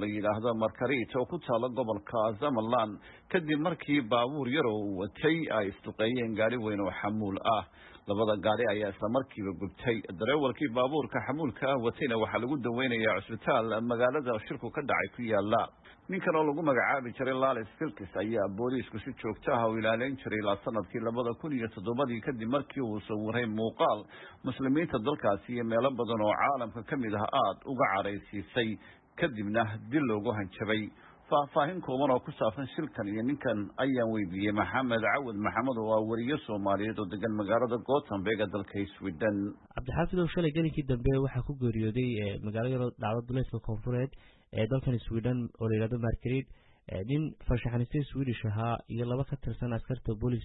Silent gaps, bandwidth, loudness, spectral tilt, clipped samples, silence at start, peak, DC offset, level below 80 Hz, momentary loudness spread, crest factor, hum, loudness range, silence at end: none; 4.1 kHz; -32 LUFS; -10.5 dB/octave; under 0.1%; 0 s; -14 dBFS; under 0.1%; -52 dBFS; 7 LU; 16 dB; none; 3 LU; 0 s